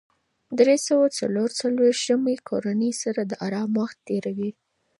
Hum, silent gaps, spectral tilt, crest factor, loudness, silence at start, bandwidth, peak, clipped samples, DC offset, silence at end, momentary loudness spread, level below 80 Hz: none; none; -4.5 dB/octave; 18 dB; -24 LUFS; 0.5 s; 11.5 kHz; -6 dBFS; under 0.1%; under 0.1%; 0.5 s; 9 LU; -74 dBFS